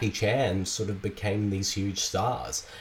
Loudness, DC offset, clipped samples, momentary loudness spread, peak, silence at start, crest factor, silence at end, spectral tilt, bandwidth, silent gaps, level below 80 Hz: -29 LUFS; under 0.1%; under 0.1%; 6 LU; -14 dBFS; 0 s; 14 dB; 0 s; -4 dB/octave; 16.5 kHz; none; -52 dBFS